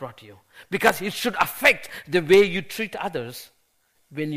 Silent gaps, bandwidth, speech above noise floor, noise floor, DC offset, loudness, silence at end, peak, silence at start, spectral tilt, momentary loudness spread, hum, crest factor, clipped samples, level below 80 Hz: none; 15.5 kHz; 44 dB; -67 dBFS; under 0.1%; -22 LUFS; 0 s; 0 dBFS; 0 s; -4 dB/octave; 19 LU; none; 24 dB; under 0.1%; -58 dBFS